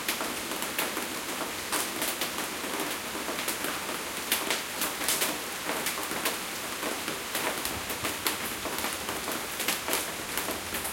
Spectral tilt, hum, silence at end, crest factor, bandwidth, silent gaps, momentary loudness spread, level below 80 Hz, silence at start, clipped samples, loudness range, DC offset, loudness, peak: -1 dB/octave; none; 0 s; 26 dB; 17 kHz; none; 5 LU; -60 dBFS; 0 s; under 0.1%; 1 LU; under 0.1%; -30 LUFS; -6 dBFS